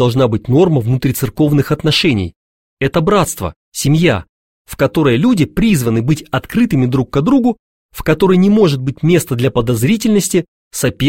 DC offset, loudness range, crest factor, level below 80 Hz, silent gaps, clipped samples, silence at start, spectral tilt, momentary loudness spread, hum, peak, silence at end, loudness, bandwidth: 0.5%; 2 LU; 14 dB; -38 dBFS; 2.36-2.77 s, 3.56-3.72 s, 4.29-4.65 s, 7.59-7.89 s, 10.48-10.71 s; under 0.1%; 0 s; -6 dB/octave; 7 LU; none; 0 dBFS; 0 s; -14 LUFS; 16.5 kHz